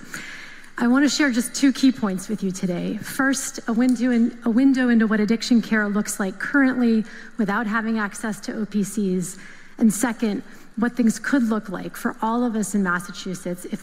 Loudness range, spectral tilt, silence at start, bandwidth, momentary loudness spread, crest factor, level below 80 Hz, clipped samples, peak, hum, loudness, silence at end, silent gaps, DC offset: 4 LU; -4.5 dB/octave; 0 s; 16 kHz; 12 LU; 16 dB; -48 dBFS; under 0.1%; -6 dBFS; none; -22 LUFS; 0 s; none; under 0.1%